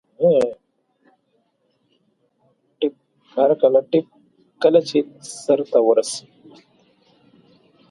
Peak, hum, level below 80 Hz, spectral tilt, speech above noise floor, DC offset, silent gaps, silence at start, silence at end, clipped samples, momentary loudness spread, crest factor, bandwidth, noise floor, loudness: -2 dBFS; none; -70 dBFS; -5 dB/octave; 50 dB; under 0.1%; none; 0.2 s; 1.7 s; under 0.1%; 13 LU; 20 dB; 11.5 kHz; -67 dBFS; -19 LUFS